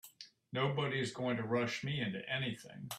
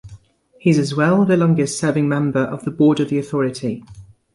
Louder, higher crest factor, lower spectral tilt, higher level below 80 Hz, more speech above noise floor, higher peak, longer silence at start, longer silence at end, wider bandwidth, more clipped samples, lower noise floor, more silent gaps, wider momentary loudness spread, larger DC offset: second, -37 LUFS vs -18 LUFS; about the same, 18 dB vs 16 dB; about the same, -5.5 dB/octave vs -6.5 dB/octave; second, -74 dBFS vs -54 dBFS; second, 20 dB vs 30 dB; second, -20 dBFS vs -4 dBFS; about the same, 0.05 s vs 0.05 s; second, 0 s vs 0.3 s; first, 15 kHz vs 11.5 kHz; neither; first, -58 dBFS vs -47 dBFS; neither; about the same, 10 LU vs 8 LU; neither